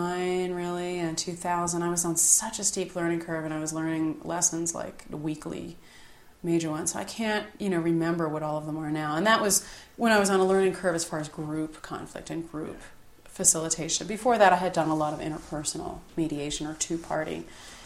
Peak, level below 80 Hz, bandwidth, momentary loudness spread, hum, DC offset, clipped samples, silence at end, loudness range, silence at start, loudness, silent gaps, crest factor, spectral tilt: -6 dBFS; -56 dBFS; 16 kHz; 15 LU; none; under 0.1%; under 0.1%; 0 s; 5 LU; 0 s; -27 LUFS; none; 22 dB; -3.5 dB/octave